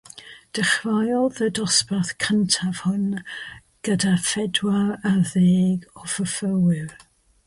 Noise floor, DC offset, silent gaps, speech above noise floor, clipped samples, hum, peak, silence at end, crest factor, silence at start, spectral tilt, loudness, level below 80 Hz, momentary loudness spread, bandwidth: -44 dBFS; under 0.1%; none; 23 dB; under 0.1%; none; -4 dBFS; 0.5 s; 18 dB; 0.15 s; -4.5 dB/octave; -22 LUFS; -58 dBFS; 13 LU; 11.5 kHz